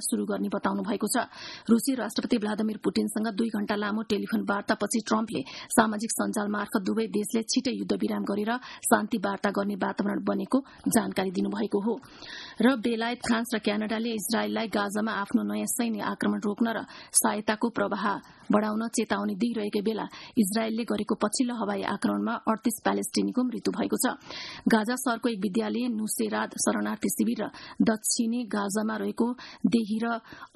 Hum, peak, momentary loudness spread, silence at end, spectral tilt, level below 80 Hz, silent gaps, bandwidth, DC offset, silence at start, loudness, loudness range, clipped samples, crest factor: none; -4 dBFS; 5 LU; 0.1 s; -4 dB/octave; -66 dBFS; none; 12.5 kHz; under 0.1%; 0 s; -28 LUFS; 1 LU; under 0.1%; 24 dB